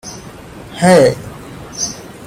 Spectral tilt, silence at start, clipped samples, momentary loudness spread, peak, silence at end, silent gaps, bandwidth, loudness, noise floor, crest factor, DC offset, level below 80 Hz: -4.5 dB/octave; 0.05 s; under 0.1%; 24 LU; 0 dBFS; 0 s; none; 16 kHz; -13 LUFS; -33 dBFS; 16 dB; under 0.1%; -44 dBFS